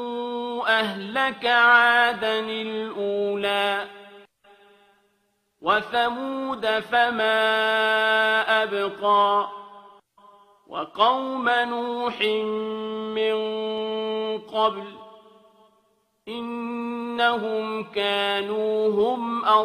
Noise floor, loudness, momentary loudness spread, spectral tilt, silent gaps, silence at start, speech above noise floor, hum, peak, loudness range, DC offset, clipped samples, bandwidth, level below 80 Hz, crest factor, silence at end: -70 dBFS; -23 LUFS; 11 LU; -4 dB/octave; none; 0 s; 47 dB; none; -4 dBFS; 8 LU; under 0.1%; under 0.1%; 14 kHz; -70 dBFS; 20 dB; 0 s